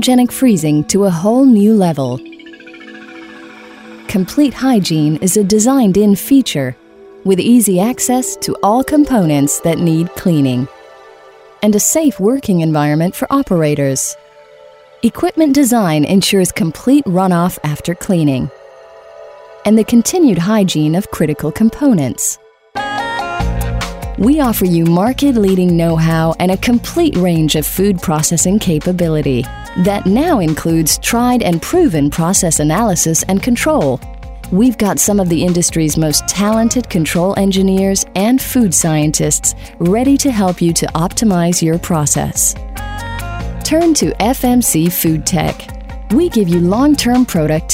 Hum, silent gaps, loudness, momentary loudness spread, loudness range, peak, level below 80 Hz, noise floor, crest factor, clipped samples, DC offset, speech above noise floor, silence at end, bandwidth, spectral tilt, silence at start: none; none; -13 LUFS; 9 LU; 3 LU; 0 dBFS; -32 dBFS; -40 dBFS; 12 dB; under 0.1%; under 0.1%; 28 dB; 0 s; 16.5 kHz; -5 dB/octave; 0 s